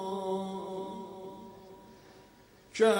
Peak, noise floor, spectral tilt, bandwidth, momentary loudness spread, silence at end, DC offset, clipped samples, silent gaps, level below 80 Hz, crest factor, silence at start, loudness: -14 dBFS; -58 dBFS; -5 dB/octave; 16 kHz; 22 LU; 0 s; under 0.1%; under 0.1%; none; -70 dBFS; 20 dB; 0 s; -36 LUFS